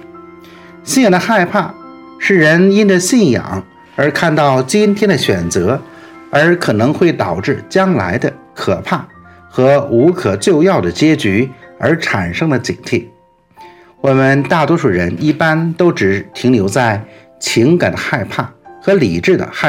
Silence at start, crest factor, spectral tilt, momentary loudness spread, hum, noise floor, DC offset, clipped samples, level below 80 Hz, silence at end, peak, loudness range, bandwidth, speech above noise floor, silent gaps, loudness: 0 s; 14 dB; -5.5 dB/octave; 9 LU; none; -44 dBFS; under 0.1%; under 0.1%; -52 dBFS; 0 s; 0 dBFS; 3 LU; 16.5 kHz; 32 dB; none; -13 LUFS